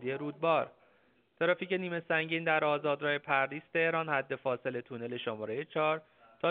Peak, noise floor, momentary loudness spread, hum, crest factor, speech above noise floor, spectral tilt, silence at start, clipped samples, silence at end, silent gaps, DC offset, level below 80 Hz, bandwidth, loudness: -14 dBFS; -69 dBFS; 8 LU; none; 20 dB; 36 dB; -3 dB/octave; 0 s; under 0.1%; 0 s; none; under 0.1%; -80 dBFS; 4.6 kHz; -32 LUFS